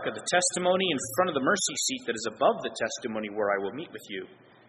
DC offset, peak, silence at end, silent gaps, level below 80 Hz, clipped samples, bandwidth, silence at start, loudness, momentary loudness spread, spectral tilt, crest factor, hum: under 0.1%; -10 dBFS; 0.35 s; none; -70 dBFS; under 0.1%; 11.5 kHz; 0 s; -27 LUFS; 13 LU; -2.5 dB/octave; 20 dB; none